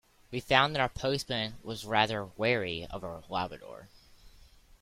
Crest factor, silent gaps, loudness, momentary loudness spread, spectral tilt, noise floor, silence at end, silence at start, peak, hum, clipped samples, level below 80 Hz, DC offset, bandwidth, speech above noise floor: 26 dB; none; -31 LUFS; 15 LU; -4.5 dB/octave; -57 dBFS; 0.35 s; 0.3 s; -6 dBFS; none; under 0.1%; -56 dBFS; under 0.1%; 16.5 kHz; 26 dB